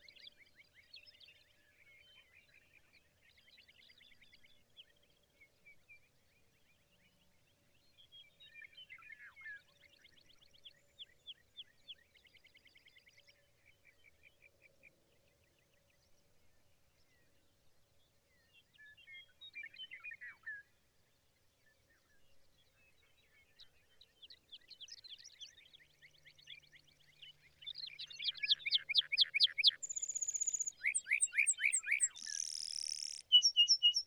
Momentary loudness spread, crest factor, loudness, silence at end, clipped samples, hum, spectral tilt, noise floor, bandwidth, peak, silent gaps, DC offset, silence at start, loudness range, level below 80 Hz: 28 LU; 26 dB; -33 LUFS; 0 s; under 0.1%; none; 4.5 dB/octave; -75 dBFS; over 20 kHz; -18 dBFS; none; under 0.1%; 0.25 s; 25 LU; -84 dBFS